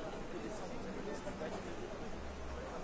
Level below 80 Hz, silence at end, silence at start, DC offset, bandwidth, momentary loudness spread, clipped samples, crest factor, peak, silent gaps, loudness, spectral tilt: -52 dBFS; 0 s; 0 s; under 0.1%; 8 kHz; 3 LU; under 0.1%; 12 dB; -30 dBFS; none; -45 LUFS; -5.5 dB/octave